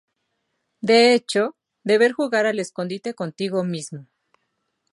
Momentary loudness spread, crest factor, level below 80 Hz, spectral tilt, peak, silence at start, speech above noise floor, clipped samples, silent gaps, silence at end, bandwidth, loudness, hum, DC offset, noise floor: 15 LU; 18 dB; -74 dBFS; -4.5 dB/octave; -4 dBFS; 0.85 s; 54 dB; under 0.1%; none; 0.9 s; 11.5 kHz; -21 LUFS; none; under 0.1%; -74 dBFS